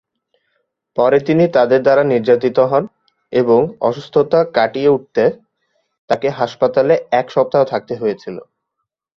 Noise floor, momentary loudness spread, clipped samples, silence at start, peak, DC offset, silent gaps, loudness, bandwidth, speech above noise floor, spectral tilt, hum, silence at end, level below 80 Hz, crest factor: -77 dBFS; 8 LU; under 0.1%; 0.95 s; -2 dBFS; under 0.1%; 5.98-6.08 s; -15 LUFS; 6.8 kHz; 62 dB; -7.5 dB/octave; none; 0.75 s; -58 dBFS; 14 dB